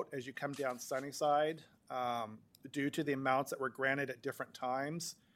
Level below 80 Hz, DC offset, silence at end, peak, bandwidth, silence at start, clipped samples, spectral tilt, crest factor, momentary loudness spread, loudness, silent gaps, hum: -84 dBFS; under 0.1%; 0.25 s; -18 dBFS; 16.5 kHz; 0 s; under 0.1%; -4.5 dB/octave; 20 dB; 10 LU; -38 LUFS; none; none